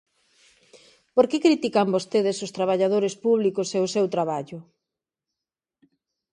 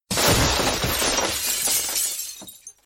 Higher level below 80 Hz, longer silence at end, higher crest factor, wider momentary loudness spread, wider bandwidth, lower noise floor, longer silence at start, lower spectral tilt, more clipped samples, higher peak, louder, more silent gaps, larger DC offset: second, -74 dBFS vs -36 dBFS; first, 1.7 s vs 0.15 s; about the same, 20 dB vs 16 dB; second, 7 LU vs 14 LU; second, 11 kHz vs 17.5 kHz; first, -88 dBFS vs -43 dBFS; first, 1.15 s vs 0.1 s; first, -5.5 dB/octave vs -2 dB/octave; neither; about the same, -6 dBFS vs -8 dBFS; second, -23 LUFS vs -20 LUFS; neither; neither